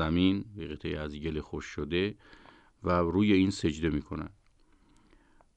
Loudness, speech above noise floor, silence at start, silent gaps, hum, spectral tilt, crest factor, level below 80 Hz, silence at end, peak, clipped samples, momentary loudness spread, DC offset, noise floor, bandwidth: -31 LUFS; 33 dB; 0 s; none; none; -6.5 dB/octave; 18 dB; -48 dBFS; 1.3 s; -12 dBFS; under 0.1%; 15 LU; under 0.1%; -63 dBFS; 9 kHz